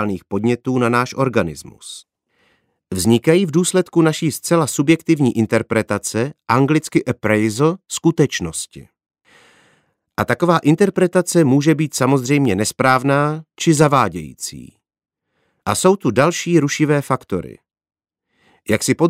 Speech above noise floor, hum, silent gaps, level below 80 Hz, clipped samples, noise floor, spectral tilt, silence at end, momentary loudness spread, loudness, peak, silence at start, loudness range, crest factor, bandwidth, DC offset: 51 dB; none; none; -52 dBFS; under 0.1%; -68 dBFS; -5.5 dB/octave; 0 s; 13 LU; -17 LUFS; 0 dBFS; 0 s; 4 LU; 16 dB; 16 kHz; under 0.1%